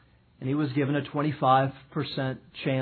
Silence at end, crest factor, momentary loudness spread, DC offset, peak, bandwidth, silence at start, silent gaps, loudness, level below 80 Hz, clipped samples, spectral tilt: 0 s; 18 dB; 11 LU; under 0.1%; -10 dBFS; 4.5 kHz; 0.4 s; none; -28 LUFS; -64 dBFS; under 0.1%; -10.5 dB/octave